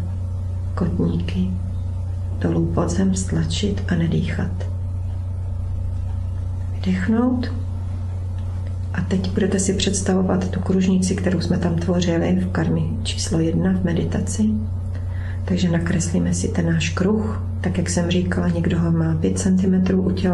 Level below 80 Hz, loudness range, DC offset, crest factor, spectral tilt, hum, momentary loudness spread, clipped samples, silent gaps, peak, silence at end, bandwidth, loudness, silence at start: -30 dBFS; 4 LU; under 0.1%; 16 dB; -6 dB/octave; none; 8 LU; under 0.1%; none; -4 dBFS; 0 s; 11.5 kHz; -21 LUFS; 0 s